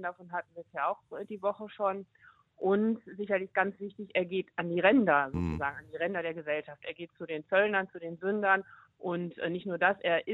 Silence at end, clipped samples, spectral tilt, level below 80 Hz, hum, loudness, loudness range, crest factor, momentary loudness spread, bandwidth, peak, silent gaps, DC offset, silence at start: 0 s; under 0.1%; -8 dB/octave; -60 dBFS; none; -31 LUFS; 4 LU; 20 dB; 13 LU; 7.4 kHz; -10 dBFS; none; under 0.1%; 0 s